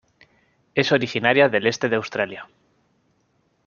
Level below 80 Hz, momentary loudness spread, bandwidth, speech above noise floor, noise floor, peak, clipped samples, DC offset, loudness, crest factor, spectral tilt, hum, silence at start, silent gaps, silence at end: -66 dBFS; 10 LU; 7.2 kHz; 46 dB; -66 dBFS; -2 dBFS; under 0.1%; under 0.1%; -20 LUFS; 22 dB; -5 dB/octave; none; 0.75 s; none; 1.2 s